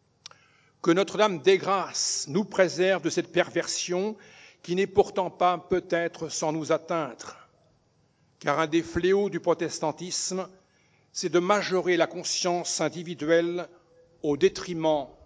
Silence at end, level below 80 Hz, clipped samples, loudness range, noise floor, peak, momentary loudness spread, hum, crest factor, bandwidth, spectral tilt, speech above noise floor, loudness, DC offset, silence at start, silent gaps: 0.15 s; -60 dBFS; under 0.1%; 4 LU; -66 dBFS; -6 dBFS; 10 LU; none; 22 dB; 8 kHz; -4 dB/octave; 40 dB; -26 LUFS; under 0.1%; 0.85 s; none